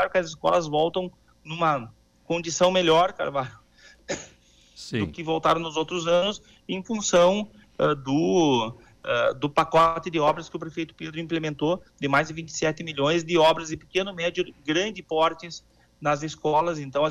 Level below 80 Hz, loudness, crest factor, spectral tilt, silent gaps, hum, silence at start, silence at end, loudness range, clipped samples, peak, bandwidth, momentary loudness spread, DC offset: -56 dBFS; -25 LUFS; 14 dB; -4.5 dB/octave; none; none; 0 s; 0 s; 4 LU; under 0.1%; -10 dBFS; 11.5 kHz; 14 LU; under 0.1%